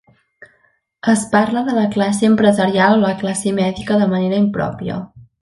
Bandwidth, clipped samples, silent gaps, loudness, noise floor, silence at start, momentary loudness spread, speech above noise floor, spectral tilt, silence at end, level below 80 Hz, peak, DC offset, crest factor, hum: 11.5 kHz; under 0.1%; none; -16 LUFS; -60 dBFS; 0.4 s; 10 LU; 45 dB; -5.5 dB/octave; 0.2 s; -50 dBFS; 0 dBFS; under 0.1%; 16 dB; none